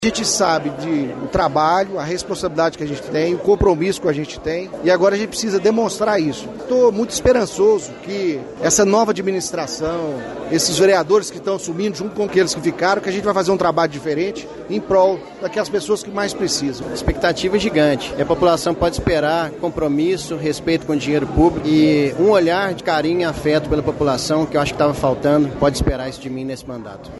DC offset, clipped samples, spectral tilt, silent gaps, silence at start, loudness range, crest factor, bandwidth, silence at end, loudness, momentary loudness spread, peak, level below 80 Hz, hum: under 0.1%; under 0.1%; -4.5 dB/octave; none; 0 s; 2 LU; 16 dB; 12 kHz; 0 s; -18 LUFS; 8 LU; -2 dBFS; -38 dBFS; none